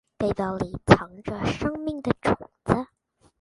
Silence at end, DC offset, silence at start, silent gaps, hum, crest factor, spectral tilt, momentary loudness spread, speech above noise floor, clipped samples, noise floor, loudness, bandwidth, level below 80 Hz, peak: 0.55 s; under 0.1%; 0.2 s; none; none; 26 dB; -7 dB/octave; 10 LU; 40 dB; under 0.1%; -64 dBFS; -25 LUFS; 11.5 kHz; -44 dBFS; 0 dBFS